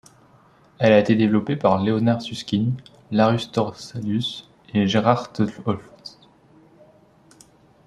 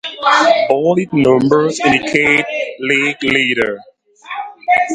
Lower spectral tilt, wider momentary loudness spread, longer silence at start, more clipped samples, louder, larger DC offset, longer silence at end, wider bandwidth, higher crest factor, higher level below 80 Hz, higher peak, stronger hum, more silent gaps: first, -7 dB/octave vs -4.5 dB/octave; about the same, 14 LU vs 12 LU; first, 0.8 s vs 0.05 s; neither; second, -21 LUFS vs -13 LUFS; neither; first, 1.8 s vs 0 s; about the same, 11 kHz vs 11 kHz; first, 22 dB vs 14 dB; second, -58 dBFS vs -52 dBFS; about the same, -2 dBFS vs 0 dBFS; neither; neither